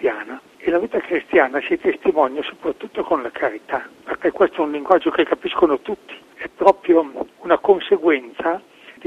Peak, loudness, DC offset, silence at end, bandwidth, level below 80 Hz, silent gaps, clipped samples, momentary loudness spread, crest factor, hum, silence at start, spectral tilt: 0 dBFS; -19 LUFS; under 0.1%; 0.15 s; 7.2 kHz; -56 dBFS; none; under 0.1%; 13 LU; 20 dB; none; 0 s; -6 dB/octave